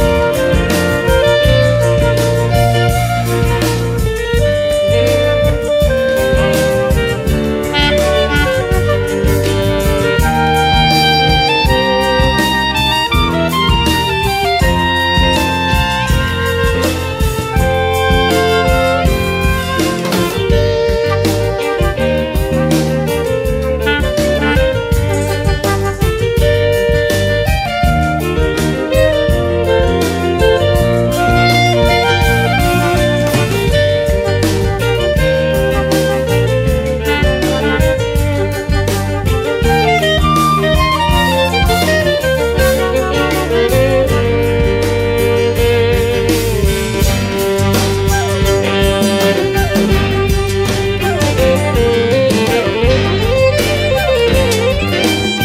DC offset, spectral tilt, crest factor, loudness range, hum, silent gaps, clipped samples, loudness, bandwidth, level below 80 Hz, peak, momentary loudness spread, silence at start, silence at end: under 0.1%; -5 dB/octave; 12 dB; 2 LU; none; none; under 0.1%; -13 LUFS; 16.5 kHz; -20 dBFS; 0 dBFS; 4 LU; 0 s; 0 s